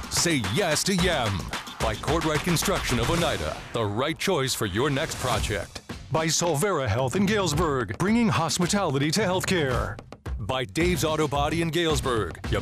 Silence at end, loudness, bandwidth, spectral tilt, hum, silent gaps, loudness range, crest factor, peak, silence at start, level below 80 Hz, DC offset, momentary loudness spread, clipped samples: 0 s; -25 LUFS; 15.5 kHz; -4 dB/octave; none; none; 2 LU; 14 dB; -12 dBFS; 0 s; -40 dBFS; under 0.1%; 7 LU; under 0.1%